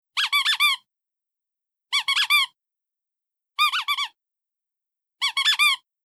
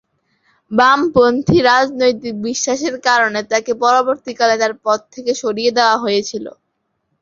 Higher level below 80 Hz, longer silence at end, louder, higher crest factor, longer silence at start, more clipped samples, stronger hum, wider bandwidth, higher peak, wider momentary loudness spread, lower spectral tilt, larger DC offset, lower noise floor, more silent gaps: second, under -90 dBFS vs -50 dBFS; second, 0.3 s vs 0.7 s; second, -20 LUFS vs -15 LUFS; about the same, 18 dB vs 16 dB; second, 0.15 s vs 0.7 s; neither; neither; first, 16.5 kHz vs 7.6 kHz; second, -8 dBFS vs 0 dBFS; about the same, 10 LU vs 9 LU; second, 7.5 dB/octave vs -3.5 dB/octave; neither; first, -87 dBFS vs -69 dBFS; neither